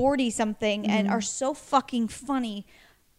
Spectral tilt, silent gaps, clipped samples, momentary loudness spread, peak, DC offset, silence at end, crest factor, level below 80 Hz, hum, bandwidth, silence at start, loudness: -4 dB/octave; none; under 0.1%; 5 LU; -8 dBFS; under 0.1%; 0.55 s; 18 dB; -58 dBFS; none; 14 kHz; 0 s; -27 LUFS